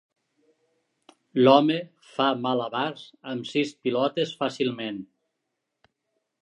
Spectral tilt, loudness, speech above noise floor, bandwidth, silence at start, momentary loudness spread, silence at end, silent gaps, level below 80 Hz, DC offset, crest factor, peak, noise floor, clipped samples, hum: -6 dB/octave; -25 LUFS; 57 dB; 9.8 kHz; 1.35 s; 16 LU; 1.4 s; none; -78 dBFS; under 0.1%; 24 dB; -4 dBFS; -81 dBFS; under 0.1%; none